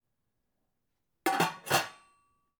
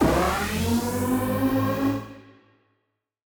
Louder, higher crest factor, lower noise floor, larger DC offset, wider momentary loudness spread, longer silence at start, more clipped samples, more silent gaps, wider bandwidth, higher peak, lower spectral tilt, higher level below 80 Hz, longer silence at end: second, -30 LUFS vs -24 LUFS; about the same, 22 dB vs 18 dB; first, -83 dBFS vs -77 dBFS; neither; first, 7 LU vs 4 LU; first, 1.25 s vs 0 s; neither; neither; about the same, over 20 kHz vs over 20 kHz; second, -14 dBFS vs -8 dBFS; second, -3 dB/octave vs -5.5 dB/octave; second, -74 dBFS vs -40 dBFS; second, 0.65 s vs 1.1 s